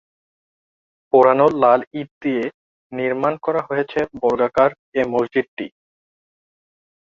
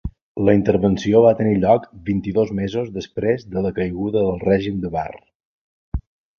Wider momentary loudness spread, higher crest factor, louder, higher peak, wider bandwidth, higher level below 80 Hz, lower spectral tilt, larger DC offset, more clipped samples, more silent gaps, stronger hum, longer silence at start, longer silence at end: about the same, 15 LU vs 15 LU; about the same, 18 dB vs 18 dB; about the same, -19 LUFS vs -19 LUFS; about the same, -2 dBFS vs -2 dBFS; about the same, 7.2 kHz vs 7 kHz; second, -60 dBFS vs -38 dBFS; about the same, -7.5 dB/octave vs -8 dB/octave; neither; neither; about the same, 1.87-1.91 s, 2.11-2.21 s, 2.54-2.90 s, 4.79-4.92 s, 5.48-5.57 s vs 0.22-0.35 s, 5.35-5.92 s; neither; first, 1.15 s vs 0.05 s; first, 1.45 s vs 0.4 s